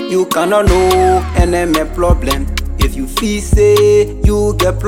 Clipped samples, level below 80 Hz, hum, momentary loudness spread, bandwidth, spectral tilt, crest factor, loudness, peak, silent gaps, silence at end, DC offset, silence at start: under 0.1%; -18 dBFS; none; 8 LU; 18 kHz; -5.5 dB/octave; 10 dB; -13 LUFS; -2 dBFS; none; 0 s; 0.7%; 0 s